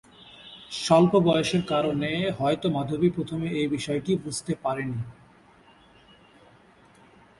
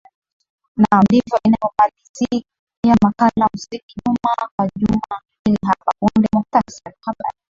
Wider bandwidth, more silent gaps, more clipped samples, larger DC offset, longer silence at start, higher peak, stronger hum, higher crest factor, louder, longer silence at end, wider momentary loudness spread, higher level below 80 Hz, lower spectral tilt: first, 11.5 kHz vs 7.4 kHz; second, none vs 2.09-2.14 s, 2.59-2.67 s, 2.77-2.83 s, 3.83-3.89 s, 4.51-4.58 s, 5.39-5.45 s; neither; neither; second, 0.25 s vs 0.75 s; second, -6 dBFS vs -2 dBFS; neither; about the same, 20 dB vs 16 dB; second, -25 LUFS vs -17 LUFS; first, 2.3 s vs 0.25 s; about the same, 16 LU vs 14 LU; second, -58 dBFS vs -46 dBFS; about the same, -6 dB/octave vs -7 dB/octave